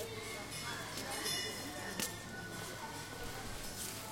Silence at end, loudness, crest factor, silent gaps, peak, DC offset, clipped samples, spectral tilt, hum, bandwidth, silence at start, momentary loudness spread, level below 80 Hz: 0 s; -41 LUFS; 24 dB; none; -20 dBFS; under 0.1%; under 0.1%; -2.5 dB/octave; none; 16.5 kHz; 0 s; 8 LU; -58 dBFS